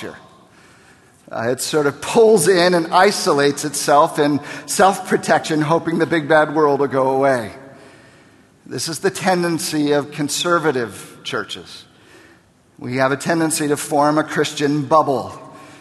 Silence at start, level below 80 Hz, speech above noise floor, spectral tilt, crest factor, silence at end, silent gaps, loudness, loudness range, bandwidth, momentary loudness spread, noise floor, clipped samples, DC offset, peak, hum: 0 s; -60 dBFS; 35 dB; -4 dB/octave; 18 dB; 0.1 s; none; -17 LUFS; 7 LU; 13 kHz; 12 LU; -52 dBFS; under 0.1%; under 0.1%; 0 dBFS; none